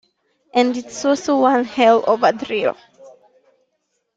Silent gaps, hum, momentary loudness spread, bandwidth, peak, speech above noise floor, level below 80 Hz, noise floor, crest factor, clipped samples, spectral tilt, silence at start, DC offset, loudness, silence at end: none; none; 8 LU; 8.8 kHz; -2 dBFS; 54 dB; -64 dBFS; -71 dBFS; 18 dB; under 0.1%; -4 dB/octave; 0.55 s; under 0.1%; -17 LUFS; 1.05 s